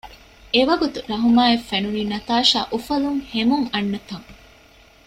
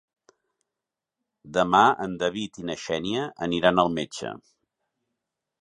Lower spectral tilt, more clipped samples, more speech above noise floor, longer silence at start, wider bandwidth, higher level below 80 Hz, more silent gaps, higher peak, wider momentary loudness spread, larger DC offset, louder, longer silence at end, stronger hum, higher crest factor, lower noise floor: about the same, -4.5 dB/octave vs -5 dB/octave; neither; second, 30 dB vs 63 dB; second, 0.05 s vs 1.45 s; first, 14 kHz vs 11 kHz; first, -50 dBFS vs -60 dBFS; neither; about the same, -4 dBFS vs -4 dBFS; second, 9 LU vs 14 LU; neither; first, -20 LUFS vs -24 LUFS; second, 0.75 s vs 1.25 s; neither; second, 18 dB vs 24 dB; second, -50 dBFS vs -87 dBFS